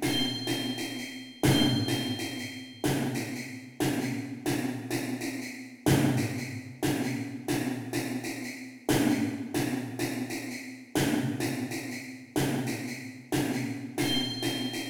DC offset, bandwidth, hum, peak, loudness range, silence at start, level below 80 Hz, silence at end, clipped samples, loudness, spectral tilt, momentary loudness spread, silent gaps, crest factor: under 0.1%; over 20 kHz; none; -12 dBFS; 3 LU; 0 s; -58 dBFS; 0 s; under 0.1%; -31 LUFS; -4.5 dB/octave; 11 LU; none; 18 dB